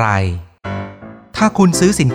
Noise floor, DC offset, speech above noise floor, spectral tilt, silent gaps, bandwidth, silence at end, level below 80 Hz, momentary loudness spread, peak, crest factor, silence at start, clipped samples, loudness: -35 dBFS; under 0.1%; 21 dB; -5.5 dB/octave; none; 15 kHz; 0 s; -40 dBFS; 17 LU; 0 dBFS; 14 dB; 0 s; under 0.1%; -15 LUFS